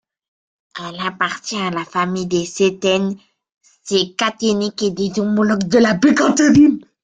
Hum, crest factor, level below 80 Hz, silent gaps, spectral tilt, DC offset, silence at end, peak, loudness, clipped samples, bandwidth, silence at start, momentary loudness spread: none; 14 dB; -54 dBFS; 3.52-3.61 s; -4.5 dB/octave; under 0.1%; 0.25 s; -2 dBFS; -17 LUFS; under 0.1%; 9.4 kHz; 0.75 s; 12 LU